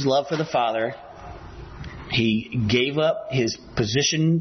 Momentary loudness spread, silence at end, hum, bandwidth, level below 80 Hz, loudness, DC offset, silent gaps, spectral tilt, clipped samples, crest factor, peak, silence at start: 20 LU; 0 s; none; 6.4 kHz; -48 dBFS; -23 LUFS; under 0.1%; none; -5 dB/octave; under 0.1%; 16 dB; -8 dBFS; 0 s